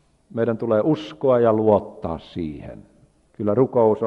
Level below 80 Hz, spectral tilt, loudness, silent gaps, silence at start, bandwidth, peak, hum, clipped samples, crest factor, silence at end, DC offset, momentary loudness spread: -52 dBFS; -9 dB/octave; -21 LUFS; none; 0.35 s; 6.8 kHz; -4 dBFS; none; under 0.1%; 18 dB; 0 s; under 0.1%; 14 LU